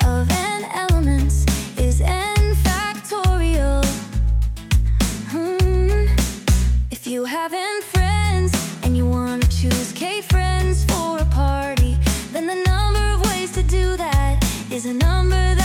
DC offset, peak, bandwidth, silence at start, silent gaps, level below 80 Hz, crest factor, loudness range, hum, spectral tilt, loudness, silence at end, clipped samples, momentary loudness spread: under 0.1%; -6 dBFS; 17.5 kHz; 0 s; none; -20 dBFS; 10 dB; 1 LU; none; -5 dB/octave; -20 LUFS; 0 s; under 0.1%; 5 LU